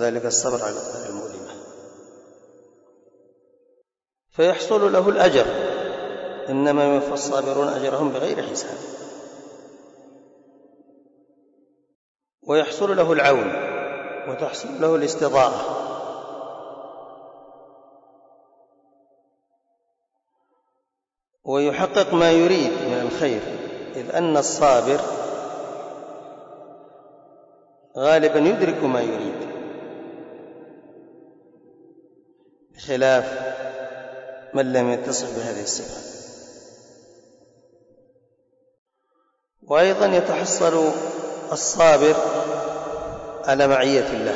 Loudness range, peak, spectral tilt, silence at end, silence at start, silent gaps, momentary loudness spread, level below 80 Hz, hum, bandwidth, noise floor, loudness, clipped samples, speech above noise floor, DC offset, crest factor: 14 LU; -6 dBFS; -4 dB/octave; 0 s; 0 s; 11.95-12.15 s, 12.34-12.38 s, 38.78-38.86 s; 22 LU; -60 dBFS; none; 8 kHz; -83 dBFS; -21 LUFS; under 0.1%; 64 dB; under 0.1%; 18 dB